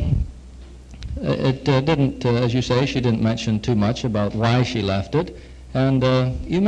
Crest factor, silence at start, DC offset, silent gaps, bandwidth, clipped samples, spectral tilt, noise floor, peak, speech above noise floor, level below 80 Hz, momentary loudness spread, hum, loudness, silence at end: 16 dB; 0 s; under 0.1%; none; 8.8 kHz; under 0.1%; -7 dB/octave; -40 dBFS; -4 dBFS; 20 dB; -36 dBFS; 10 LU; none; -21 LUFS; 0 s